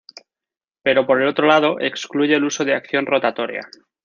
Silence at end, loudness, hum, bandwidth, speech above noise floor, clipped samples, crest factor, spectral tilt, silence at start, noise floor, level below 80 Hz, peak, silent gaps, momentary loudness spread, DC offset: 0.4 s; -18 LUFS; none; 7.4 kHz; 72 dB; under 0.1%; 18 dB; -4 dB/octave; 0.85 s; -90 dBFS; -68 dBFS; -2 dBFS; none; 9 LU; under 0.1%